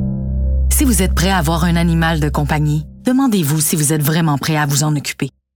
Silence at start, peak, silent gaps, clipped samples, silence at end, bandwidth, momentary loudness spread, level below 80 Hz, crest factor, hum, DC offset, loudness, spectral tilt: 0 s; -4 dBFS; none; under 0.1%; 0.25 s; 19 kHz; 6 LU; -22 dBFS; 12 dB; none; under 0.1%; -15 LUFS; -5 dB/octave